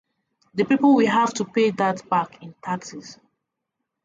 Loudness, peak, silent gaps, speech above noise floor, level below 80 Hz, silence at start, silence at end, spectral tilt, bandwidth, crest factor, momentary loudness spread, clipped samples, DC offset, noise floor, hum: -21 LUFS; -6 dBFS; none; 60 dB; -68 dBFS; 0.55 s; 0.9 s; -5.5 dB/octave; 7.8 kHz; 16 dB; 18 LU; under 0.1%; under 0.1%; -81 dBFS; none